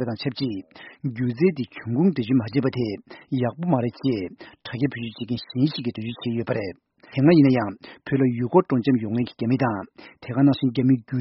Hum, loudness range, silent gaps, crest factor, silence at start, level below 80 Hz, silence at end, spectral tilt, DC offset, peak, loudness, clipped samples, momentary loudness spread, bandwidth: none; 5 LU; none; 20 dB; 0 s; -60 dBFS; 0 s; -7 dB/octave; under 0.1%; -4 dBFS; -23 LUFS; under 0.1%; 13 LU; 5.8 kHz